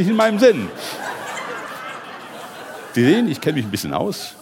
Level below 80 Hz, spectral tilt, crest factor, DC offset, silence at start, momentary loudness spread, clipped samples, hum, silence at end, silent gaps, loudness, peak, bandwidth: -62 dBFS; -5.5 dB/octave; 18 dB; under 0.1%; 0 s; 19 LU; under 0.1%; none; 0 s; none; -20 LUFS; -2 dBFS; 17 kHz